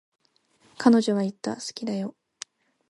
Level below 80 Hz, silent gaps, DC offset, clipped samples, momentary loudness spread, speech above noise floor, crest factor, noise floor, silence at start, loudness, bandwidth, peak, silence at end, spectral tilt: -72 dBFS; none; under 0.1%; under 0.1%; 22 LU; 40 dB; 22 dB; -64 dBFS; 0.8 s; -25 LUFS; 11.5 kHz; -6 dBFS; 0.8 s; -5.5 dB/octave